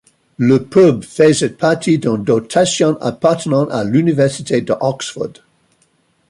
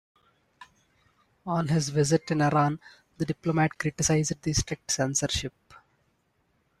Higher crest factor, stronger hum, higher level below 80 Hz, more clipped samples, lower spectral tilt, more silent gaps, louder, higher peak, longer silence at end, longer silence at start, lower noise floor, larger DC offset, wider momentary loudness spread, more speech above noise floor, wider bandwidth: about the same, 14 dB vs 18 dB; neither; about the same, -54 dBFS vs -50 dBFS; neither; about the same, -5.5 dB/octave vs -4.5 dB/octave; neither; first, -15 LUFS vs -27 LUFS; first, -2 dBFS vs -12 dBFS; second, 1 s vs 1.3 s; second, 0.4 s vs 0.6 s; second, -59 dBFS vs -71 dBFS; neither; about the same, 7 LU vs 8 LU; about the same, 45 dB vs 45 dB; second, 11.5 kHz vs 13.5 kHz